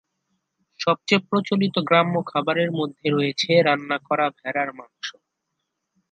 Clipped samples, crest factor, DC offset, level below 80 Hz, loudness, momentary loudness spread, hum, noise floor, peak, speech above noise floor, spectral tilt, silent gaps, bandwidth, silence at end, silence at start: under 0.1%; 18 dB; under 0.1%; -72 dBFS; -22 LUFS; 10 LU; none; -79 dBFS; -4 dBFS; 57 dB; -5.5 dB/octave; none; 9 kHz; 1 s; 0.8 s